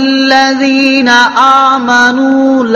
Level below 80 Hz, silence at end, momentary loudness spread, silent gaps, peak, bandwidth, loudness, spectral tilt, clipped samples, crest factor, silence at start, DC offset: -52 dBFS; 0 s; 3 LU; none; 0 dBFS; 7.4 kHz; -7 LUFS; -2.5 dB/octave; 1%; 8 dB; 0 s; under 0.1%